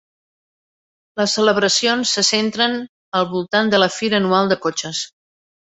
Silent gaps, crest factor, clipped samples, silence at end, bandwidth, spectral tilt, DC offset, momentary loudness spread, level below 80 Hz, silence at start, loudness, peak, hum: 2.89-3.12 s; 18 dB; under 0.1%; 0.7 s; 8.4 kHz; -3 dB/octave; under 0.1%; 10 LU; -62 dBFS; 1.15 s; -17 LUFS; -2 dBFS; none